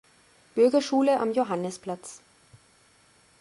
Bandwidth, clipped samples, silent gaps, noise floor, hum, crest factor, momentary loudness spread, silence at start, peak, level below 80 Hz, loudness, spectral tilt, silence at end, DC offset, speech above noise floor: 11.5 kHz; under 0.1%; none; -60 dBFS; none; 16 dB; 15 LU; 0.55 s; -10 dBFS; -72 dBFS; -25 LUFS; -5 dB/octave; 1.25 s; under 0.1%; 36 dB